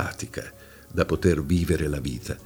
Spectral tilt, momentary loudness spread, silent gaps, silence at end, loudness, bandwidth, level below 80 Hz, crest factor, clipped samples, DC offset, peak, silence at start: -6.5 dB/octave; 13 LU; none; 0 s; -26 LUFS; over 20 kHz; -38 dBFS; 20 dB; under 0.1%; under 0.1%; -6 dBFS; 0 s